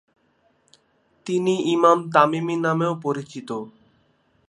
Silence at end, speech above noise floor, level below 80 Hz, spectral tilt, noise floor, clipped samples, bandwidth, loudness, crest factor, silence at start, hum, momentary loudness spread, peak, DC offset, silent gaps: 0.8 s; 43 dB; -74 dBFS; -6 dB/octave; -64 dBFS; under 0.1%; 11 kHz; -21 LUFS; 22 dB; 1.25 s; none; 15 LU; -2 dBFS; under 0.1%; none